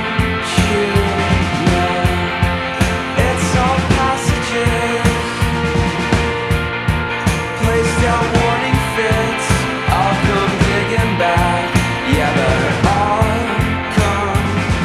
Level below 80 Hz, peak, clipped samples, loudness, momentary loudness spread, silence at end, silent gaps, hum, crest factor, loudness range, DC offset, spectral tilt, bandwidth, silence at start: -26 dBFS; 0 dBFS; under 0.1%; -15 LUFS; 3 LU; 0 s; none; none; 14 dB; 2 LU; under 0.1%; -5.5 dB/octave; 14.5 kHz; 0 s